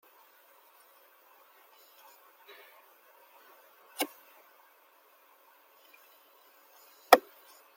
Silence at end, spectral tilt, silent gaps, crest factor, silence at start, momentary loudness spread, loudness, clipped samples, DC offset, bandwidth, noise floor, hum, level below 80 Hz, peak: 0.6 s; -1 dB/octave; none; 36 dB; 4 s; 32 LU; -27 LUFS; under 0.1%; under 0.1%; 16.5 kHz; -63 dBFS; none; -80 dBFS; 0 dBFS